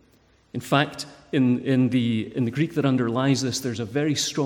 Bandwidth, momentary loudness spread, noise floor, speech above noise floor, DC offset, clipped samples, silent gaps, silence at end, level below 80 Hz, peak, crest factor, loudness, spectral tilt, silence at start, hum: 17 kHz; 7 LU; -59 dBFS; 36 dB; under 0.1%; under 0.1%; none; 0 s; -62 dBFS; -6 dBFS; 18 dB; -23 LUFS; -5.5 dB/octave; 0.55 s; none